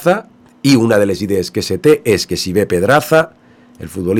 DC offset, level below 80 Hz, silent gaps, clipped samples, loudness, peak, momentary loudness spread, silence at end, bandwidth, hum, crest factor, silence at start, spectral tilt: under 0.1%; -46 dBFS; none; under 0.1%; -14 LUFS; 0 dBFS; 10 LU; 0 s; 18 kHz; none; 14 dB; 0 s; -5 dB/octave